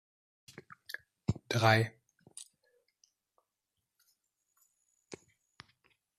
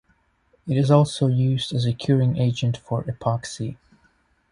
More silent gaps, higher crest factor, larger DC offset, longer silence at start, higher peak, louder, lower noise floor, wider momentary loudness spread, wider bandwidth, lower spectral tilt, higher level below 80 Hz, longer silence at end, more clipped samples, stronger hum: neither; first, 26 dB vs 20 dB; neither; first, 0.9 s vs 0.65 s; second, -12 dBFS vs -2 dBFS; second, -31 LUFS vs -22 LUFS; first, -87 dBFS vs -64 dBFS; first, 27 LU vs 12 LU; first, 14.5 kHz vs 11 kHz; second, -5 dB/octave vs -7 dB/octave; second, -68 dBFS vs -54 dBFS; first, 1.05 s vs 0.8 s; neither; neither